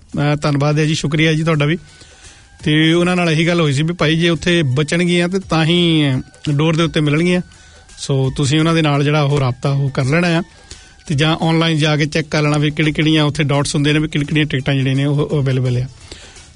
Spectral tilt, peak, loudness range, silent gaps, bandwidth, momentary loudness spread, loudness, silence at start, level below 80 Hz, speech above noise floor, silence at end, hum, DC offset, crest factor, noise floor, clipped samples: -6 dB/octave; -2 dBFS; 2 LU; none; 11 kHz; 6 LU; -15 LUFS; 0.15 s; -42 dBFS; 27 dB; 0.15 s; none; under 0.1%; 14 dB; -42 dBFS; under 0.1%